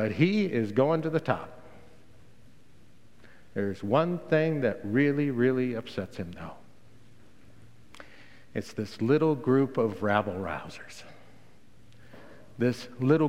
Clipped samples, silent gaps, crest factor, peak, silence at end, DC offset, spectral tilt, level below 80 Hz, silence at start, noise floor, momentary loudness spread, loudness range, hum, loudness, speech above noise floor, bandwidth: under 0.1%; none; 22 dB; -8 dBFS; 0 s; 0.4%; -7.5 dB/octave; -64 dBFS; 0 s; -59 dBFS; 19 LU; 6 LU; none; -28 LUFS; 32 dB; 15 kHz